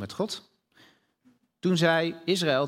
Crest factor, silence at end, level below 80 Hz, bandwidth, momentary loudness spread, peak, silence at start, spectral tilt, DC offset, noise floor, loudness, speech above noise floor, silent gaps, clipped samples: 20 dB; 0 s; -72 dBFS; 16 kHz; 10 LU; -8 dBFS; 0 s; -5 dB/octave; under 0.1%; -65 dBFS; -26 LUFS; 39 dB; none; under 0.1%